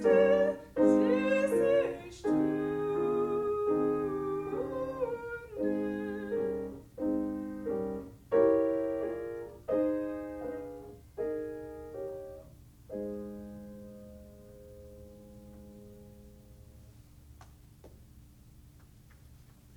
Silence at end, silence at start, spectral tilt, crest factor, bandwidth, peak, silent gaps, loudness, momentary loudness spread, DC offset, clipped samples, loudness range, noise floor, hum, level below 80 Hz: 0 s; 0 s; -7.5 dB/octave; 20 dB; 17.5 kHz; -14 dBFS; none; -32 LUFS; 25 LU; under 0.1%; under 0.1%; 23 LU; -56 dBFS; none; -58 dBFS